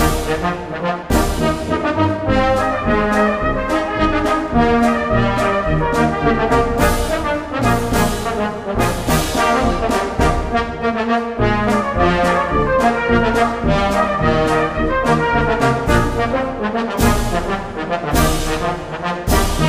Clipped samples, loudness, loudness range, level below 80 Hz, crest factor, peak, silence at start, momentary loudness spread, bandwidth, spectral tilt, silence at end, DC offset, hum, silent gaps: under 0.1%; -17 LUFS; 2 LU; -26 dBFS; 16 dB; 0 dBFS; 0 s; 5 LU; 15.5 kHz; -5.5 dB/octave; 0 s; under 0.1%; none; none